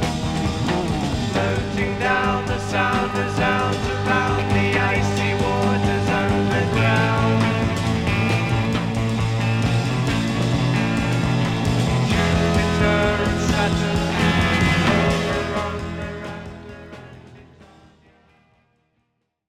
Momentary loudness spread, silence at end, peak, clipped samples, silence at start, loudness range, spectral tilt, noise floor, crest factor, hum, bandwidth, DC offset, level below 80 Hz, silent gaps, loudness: 5 LU; 2.05 s; -6 dBFS; under 0.1%; 0 s; 4 LU; -6 dB/octave; -72 dBFS; 16 dB; none; 14 kHz; under 0.1%; -36 dBFS; none; -20 LUFS